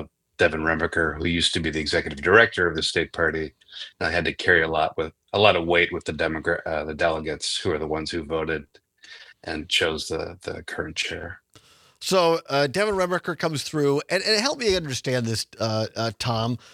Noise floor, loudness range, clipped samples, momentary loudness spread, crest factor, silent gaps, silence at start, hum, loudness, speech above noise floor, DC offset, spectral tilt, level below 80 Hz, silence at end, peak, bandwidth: -55 dBFS; 6 LU; under 0.1%; 12 LU; 24 dB; none; 0 s; none; -23 LUFS; 31 dB; under 0.1%; -4 dB/octave; -50 dBFS; 0.15 s; 0 dBFS; 15.5 kHz